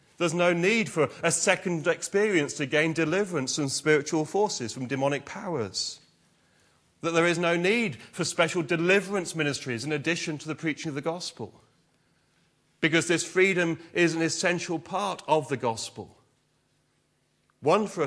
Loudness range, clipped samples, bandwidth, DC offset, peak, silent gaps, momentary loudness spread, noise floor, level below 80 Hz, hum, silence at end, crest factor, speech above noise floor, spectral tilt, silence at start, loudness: 6 LU; under 0.1%; 11 kHz; under 0.1%; -6 dBFS; none; 9 LU; -70 dBFS; -72 dBFS; none; 0 s; 22 dB; 44 dB; -4 dB/octave; 0.2 s; -26 LUFS